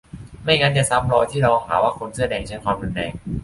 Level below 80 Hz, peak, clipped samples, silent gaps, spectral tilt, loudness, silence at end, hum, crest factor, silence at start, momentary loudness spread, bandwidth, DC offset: -40 dBFS; -2 dBFS; under 0.1%; none; -4.5 dB/octave; -20 LUFS; 0 s; none; 18 dB; 0.15 s; 11 LU; 11.5 kHz; under 0.1%